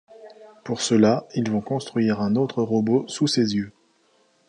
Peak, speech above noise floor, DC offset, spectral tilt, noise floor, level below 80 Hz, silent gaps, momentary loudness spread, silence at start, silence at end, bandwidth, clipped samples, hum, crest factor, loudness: -4 dBFS; 41 dB; under 0.1%; -5.5 dB/octave; -62 dBFS; -62 dBFS; none; 9 LU; 0.1 s; 0.8 s; 10.5 kHz; under 0.1%; none; 18 dB; -22 LUFS